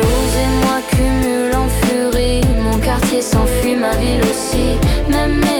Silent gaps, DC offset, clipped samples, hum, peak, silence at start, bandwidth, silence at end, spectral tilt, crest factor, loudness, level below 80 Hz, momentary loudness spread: none; under 0.1%; under 0.1%; none; -4 dBFS; 0 s; 18 kHz; 0 s; -5 dB/octave; 10 dB; -15 LUFS; -20 dBFS; 1 LU